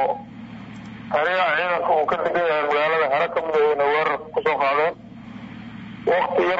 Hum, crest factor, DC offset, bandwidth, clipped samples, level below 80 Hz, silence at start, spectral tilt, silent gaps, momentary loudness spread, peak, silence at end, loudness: none; 12 dB; under 0.1%; 7.6 kHz; under 0.1%; -58 dBFS; 0 s; -6 dB/octave; none; 18 LU; -10 dBFS; 0 s; -21 LUFS